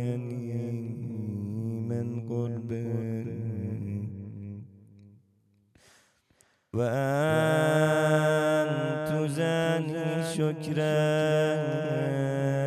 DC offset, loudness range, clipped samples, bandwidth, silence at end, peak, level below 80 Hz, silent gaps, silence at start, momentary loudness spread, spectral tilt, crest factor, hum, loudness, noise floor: under 0.1%; 12 LU; under 0.1%; 13.5 kHz; 0 s; -12 dBFS; -68 dBFS; none; 0 s; 11 LU; -6.5 dB/octave; 16 dB; none; -28 LUFS; -67 dBFS